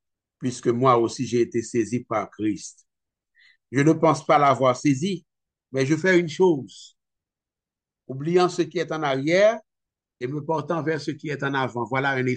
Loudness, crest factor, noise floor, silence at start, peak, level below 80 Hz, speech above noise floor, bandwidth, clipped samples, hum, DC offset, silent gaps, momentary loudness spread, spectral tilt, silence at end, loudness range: -23 LUFS; 18 dB; -89 dBFS; 0.4 s; -6 dBFS; -68 dBFS; 67 dB; 9.4 kHz; under 0.1%; none; under 0.1%; none; 13 LU; -6 dB/octave; 0 s; 4 LU